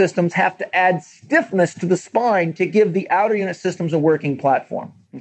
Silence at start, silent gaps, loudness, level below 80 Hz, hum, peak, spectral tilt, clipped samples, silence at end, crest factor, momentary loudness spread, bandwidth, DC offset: 0 s; none; -19 LUFS; -80 dBFS; none; -4 dBFS; -6.5 dB/octave; under 0.1%; 0 s; 16 dB; 6 LU; 8.6 kHz; under 0.1%